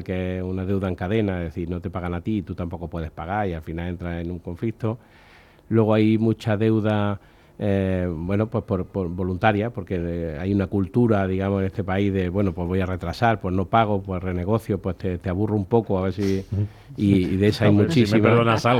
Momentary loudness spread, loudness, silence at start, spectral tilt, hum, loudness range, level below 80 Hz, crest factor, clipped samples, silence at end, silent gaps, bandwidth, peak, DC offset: 11 LU; -23 LUFS; 0 s; -8 dB/octave; none; 6 LU; -48 dBFS; 20 dB; under 0.1%; 0 s; none; 13 kHz; -2 dBFS; under 0.1%